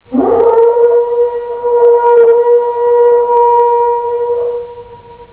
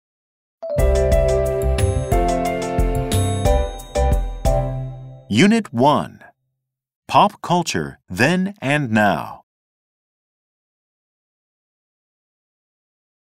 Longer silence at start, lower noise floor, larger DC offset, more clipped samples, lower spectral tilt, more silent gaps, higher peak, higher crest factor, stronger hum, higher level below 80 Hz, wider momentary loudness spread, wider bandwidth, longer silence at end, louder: second, 0.1 s vs 0.6 s; second, -34 dBFS vs -77 dBFS; first, 0.1% vs under 0.1%; neither; first, -10 dB/octave vs -5.5 dB/octave; second, none vs 6.95-7.02 s; about the same, 0 dBFS vs -2 dBFS; second, 10 dB vs 18 dB; neither; second, -50 dBFS vs -26 dBFS; about the same, 9 LU vs 10 LU; second, 4 kHz vs 16 kHz; second, 0.1 s vs 3.95 s; first, -10 LUFS vs -19 LUFS